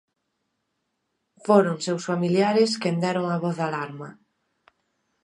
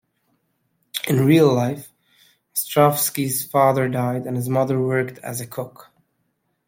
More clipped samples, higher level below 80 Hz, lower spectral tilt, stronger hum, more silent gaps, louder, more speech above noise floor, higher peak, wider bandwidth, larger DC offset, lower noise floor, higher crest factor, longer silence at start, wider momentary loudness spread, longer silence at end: neither; second, -76 dBFS vs -62 dBFS; about the same, -6 dB/octave vs -5.5 dB/octave; neither; neither; second, -23 LUFS vs -20 LUFS; about the same, 54 dB vs 52 dB; about the same, -4 dBFS vs -2 dBFS; second, 11 kHz vs 16.5 kHz; neither; first, -77 dBFS vs -71 dBFS; about the same, 22 dB vs 18 dB; first, 1.45 s vs 0.95 s; about the same, 15 LU vs 15 LU; first, 1.1 s vs 0.85 s